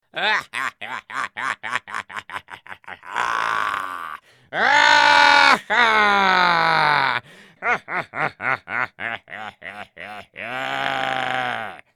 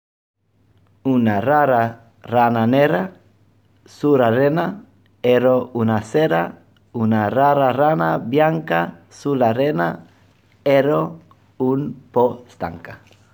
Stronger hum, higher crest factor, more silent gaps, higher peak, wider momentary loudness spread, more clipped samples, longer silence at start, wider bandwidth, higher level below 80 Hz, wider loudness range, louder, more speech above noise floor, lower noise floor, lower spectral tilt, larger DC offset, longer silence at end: neither; about the same, 20 dB vs 16 dB; neither; about the same, 0 dBFS vs -2 dBFS; first, 22 LU vs 13 LU; neither; second, 0.15 s vs 1.05 s; second, 16.5 kHz vs 19.5 kHz; about the same, -62 dBFS vs -60 dBFS; first, 11 LU vs 3 LU; about the same, -19 LUFS vs -18 LUFS; second, 15 dB vs 41 dB; second, -40 dBFS vs -58 dBFS; second, -2 dB/octave vs -8 dB/octave; neither; second, 0.2 s vs 0.4 s